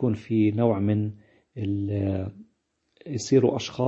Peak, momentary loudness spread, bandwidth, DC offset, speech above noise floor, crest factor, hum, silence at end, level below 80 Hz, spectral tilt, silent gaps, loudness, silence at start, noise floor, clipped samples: -8 dBFS; 13 LU; 8 kHz; under 0.1%; 47 dB; 18 dB; none; 0 s; -62 dBFS; -7 dB/octave; none; -25 LUFS; 0 s; -72 dBFS; under 0.1%